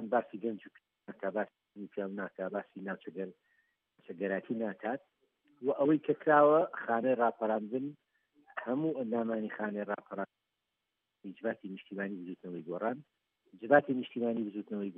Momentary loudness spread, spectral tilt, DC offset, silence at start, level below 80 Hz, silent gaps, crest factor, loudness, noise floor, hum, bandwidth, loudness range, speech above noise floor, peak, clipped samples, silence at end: 17 LU; -5.5 dB/octave; under 0.1%; 0 s; under -90 dBFS; none; 24 dB; -34 LUFS; -86 dBFS; none; 3.8 kHz; 11 LU; 53 dB; -10 dBFS; under 0.1%; 0.05 s